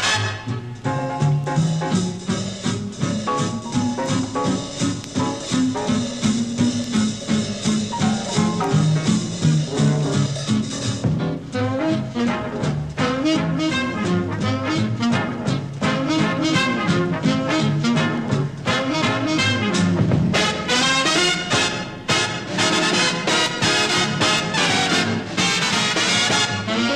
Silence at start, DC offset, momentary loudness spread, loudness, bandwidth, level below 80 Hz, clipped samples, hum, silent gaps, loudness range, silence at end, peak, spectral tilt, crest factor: 0 s; 0.1%; 7 LU; -20 LUFS; 13 kHz; -48 dBFS; under 0.1%; none; none; 5 LU; 0 s; -6 dBFS; -4 dB/octave; 16 dB